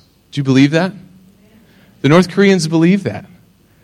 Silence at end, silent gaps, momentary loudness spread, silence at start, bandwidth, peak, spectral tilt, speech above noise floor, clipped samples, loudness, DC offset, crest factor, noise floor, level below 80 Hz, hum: 0.6 s; none; 12 LU; 0.35 s; 12.5 kHz; 0 dBFS; -6.5 dB/octave; 36 dB; under 0.1%; -13 LUFS; under 0.1%; 14 dB; -48 dBFS; -54 dBFS; none